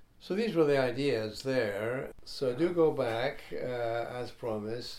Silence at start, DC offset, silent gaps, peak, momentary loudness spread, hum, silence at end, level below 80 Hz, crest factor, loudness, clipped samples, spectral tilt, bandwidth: 0 s; under 0.1%; none; -16 dBFS; 10 LU; none; 0 s; -58 dBFS; 16 dB; -32 LUFS; under 0.1%; -6 dB/octave; 14.5 kHz